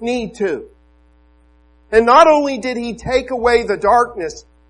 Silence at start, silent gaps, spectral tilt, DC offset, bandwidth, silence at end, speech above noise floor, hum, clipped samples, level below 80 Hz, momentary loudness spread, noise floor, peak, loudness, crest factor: 0 s; none; -4.5 dB/octave; under 0.1%; 11 kHz; 0.3 s; 36 dB; none; under 0.1%; -42 dBFS; 14 LU; -51 dBFS; 0 dBFS; -15 LUFS; 16 dB